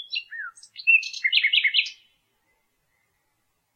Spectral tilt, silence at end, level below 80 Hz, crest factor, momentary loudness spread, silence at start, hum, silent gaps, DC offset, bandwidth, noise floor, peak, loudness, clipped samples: 5.5 dB/octave; 1.85 s; -84 dBFS; 22 dB; 18 LU; 0 s; none; none; under 0.1%; 15.5 kHz; -73 dBFS; -6 dBFS; -20 LUFS; under 0.1%